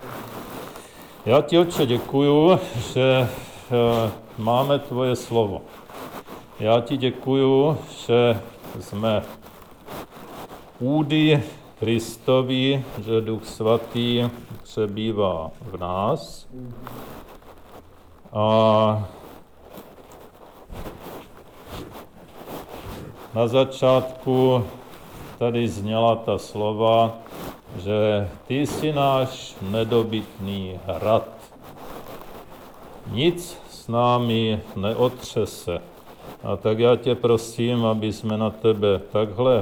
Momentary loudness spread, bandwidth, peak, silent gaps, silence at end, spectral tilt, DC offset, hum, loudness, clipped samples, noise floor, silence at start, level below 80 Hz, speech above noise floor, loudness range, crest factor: 21 LU; over 20 kHz; -4 dBFS; none; 0 s; -6.5 dB/octave; under 0.1%; none; -22 LUFS; under 0.1%; -47 dBFS; 0 s; -50 dBFS; 26 dB; 7 LU; 18 dB